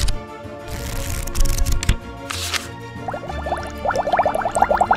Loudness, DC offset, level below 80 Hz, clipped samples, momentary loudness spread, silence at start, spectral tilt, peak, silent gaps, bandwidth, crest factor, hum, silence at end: -23 LUFS; under 0.1%; -26 dBFS; under 0.1%; 13 LU; 0 s; -4 dB/octave; -2 dBFS; none; 16 kHz; 20 dB; none; 0 s